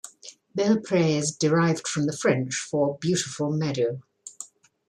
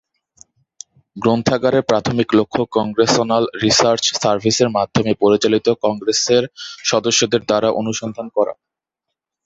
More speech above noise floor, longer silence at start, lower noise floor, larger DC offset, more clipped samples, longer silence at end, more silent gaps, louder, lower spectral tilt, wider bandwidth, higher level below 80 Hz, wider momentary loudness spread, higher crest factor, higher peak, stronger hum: second, 22 dB vs 64 dB; second, 0.05 s vs 1.15 s; second, -46 dBFS vs -81 dBFS; neither; neither; second, 0.45 s vs 0.95 s; neither; second, -25 LUFS vs -16 LUFS; about the same, -5 dB/octave vs -4 dB/octave; first, 12.5 kHz vs 8.2 kHz; second, -68 dBFS vs -52 dBFS; first, 19 LU vs 7 LU; about the same, 16 dB vs 18 dB; second, -8 dBFS vs 0 dBFS; neither